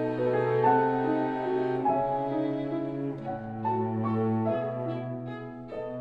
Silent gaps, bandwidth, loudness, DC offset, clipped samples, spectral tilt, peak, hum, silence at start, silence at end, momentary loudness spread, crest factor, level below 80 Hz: none; 5.4 kHz; -29 LUFS; under 0.1%; under 0.1%; -9.5 dB/octave; -10 dBFS; none; 0 s; 0 s; 12 LU; 18 dB; -60 dBFS